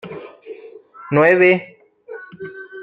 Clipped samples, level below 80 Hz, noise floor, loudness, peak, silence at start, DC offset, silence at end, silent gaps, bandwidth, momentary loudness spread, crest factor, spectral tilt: under 0.1%; -62 dBFS; -40 dBFS; -14 LUFS; -2 dBFS; 0.05 s; under 0.1%; 0 s; none; 4.6 kHz; 25 LU; 18 dB; -8.5 dB/octave